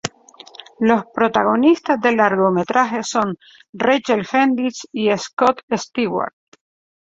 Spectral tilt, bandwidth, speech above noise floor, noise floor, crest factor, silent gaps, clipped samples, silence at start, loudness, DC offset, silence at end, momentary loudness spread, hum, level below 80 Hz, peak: -5 dB/octave; 7.8 kHz; 27 dB; -44 dBFS; 18 dB; 3.69-3.73 s, 5.33-5.37 s, 5.63-5.68 s; under 0.1%; 0.05 s; -18 LUFS; under 0.1%; 0.7 s; 9 LU; none; -60 dBFS; 0 dBFS